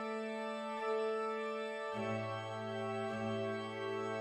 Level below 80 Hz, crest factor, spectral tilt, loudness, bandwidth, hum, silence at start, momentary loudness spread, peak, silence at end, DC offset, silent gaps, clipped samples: -82 dBFS; 14 dB; -6 dB/octave; -40 LUFS; 11.5 kHz; none; 0 s; 4 LU; -26 dBFS; 0 s; under 0.1%; none; under 0.1%